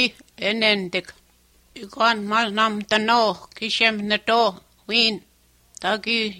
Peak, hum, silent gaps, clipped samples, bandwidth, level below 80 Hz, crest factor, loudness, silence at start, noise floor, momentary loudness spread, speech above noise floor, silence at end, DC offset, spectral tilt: -4 dBFS; none; none; under 0.1%; 16 kHz; -62 dBFS; 20 dB; -21 LUFS; 0 s; -58 dBFS; 10 LU; 36 dB; 0 s; under 0.1%; -3.5 dB/octave